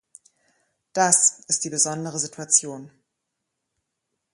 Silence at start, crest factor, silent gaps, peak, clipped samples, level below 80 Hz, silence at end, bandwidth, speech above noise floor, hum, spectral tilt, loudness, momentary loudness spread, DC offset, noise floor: 0.95 s; 26 dB; none; 0 dBFS; under 0.1%; -74 dBFS; 1.45 s; 11.5 kHz; 57 dB; none; -1.5 dB/octave; -20 LUFS; 15 LU; under 0.1%; -80 dBFS